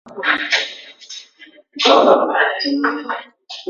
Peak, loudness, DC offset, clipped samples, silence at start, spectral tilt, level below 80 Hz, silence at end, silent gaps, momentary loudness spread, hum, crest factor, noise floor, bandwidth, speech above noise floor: 0 dBFS; -16 LUFS; under 0.1%; under 0.1%; 0.05 s; -2 dB/octave; -66 dBFS; 0 s; none; 22 LU; none; 18 dB; -46 dBFS; 7.6 kHz; 31 dB